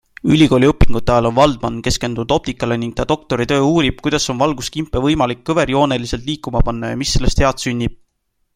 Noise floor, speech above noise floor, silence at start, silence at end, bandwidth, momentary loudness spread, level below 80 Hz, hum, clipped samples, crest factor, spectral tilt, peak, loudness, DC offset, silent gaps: -67 dBFS; 52 dB; 0.25 s; 0.6 s; 15.5 kHz; 8 LU; -26 dBFS; none; under 0.1%; 14 dB; -5.5 dB/octave; 0 dBFS; -17 LUFS; under 0.1%; none